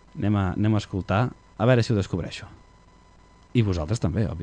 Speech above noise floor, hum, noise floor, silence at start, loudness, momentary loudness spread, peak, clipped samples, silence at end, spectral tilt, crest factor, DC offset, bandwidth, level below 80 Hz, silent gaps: 30 dB; none; -53 dBFS; 0.15 s; -25 LUFS; 8 LU; -6 dBFS; under 0.1%; 0 s; -7.5 dB/octave; 18 dB; under 0.1%; 9.4 kHz; -44 dBFS; none